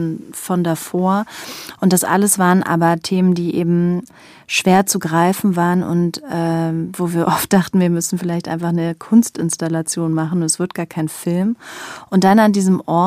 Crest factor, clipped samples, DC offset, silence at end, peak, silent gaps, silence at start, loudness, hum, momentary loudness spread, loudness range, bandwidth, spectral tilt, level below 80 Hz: 16 dB; under 0.1%; under 0.1%; 0 s; -2 dBFS; none; 0 s; -17 LUFS; none; 9 LU; 3 LU; 15.5 kHz; -5.5 dB/octave; -58 dBFS